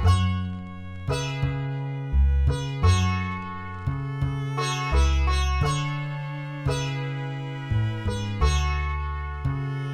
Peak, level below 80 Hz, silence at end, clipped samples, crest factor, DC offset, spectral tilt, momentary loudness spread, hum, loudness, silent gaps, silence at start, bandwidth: -8 dBFS; -28 dBFS; 0 s; under 0.1%; 16 dB; under 0.1%; -5.5 dB/octave; 10 LU; none; -26 LUFS; none; 0 s; 11.5 kHz